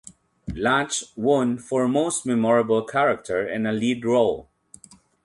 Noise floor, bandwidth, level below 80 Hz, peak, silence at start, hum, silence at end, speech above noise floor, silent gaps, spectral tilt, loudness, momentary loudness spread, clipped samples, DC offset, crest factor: -50 dBFS; 11.5 kHz; -52 dBFS; -6 dBFS; 0.05 s; none; 0.8 s; 28 dB; none; -4.5 dB/octave; -22 LUFS; 6 LU; under 0.1%; under 0.1%; 16 dB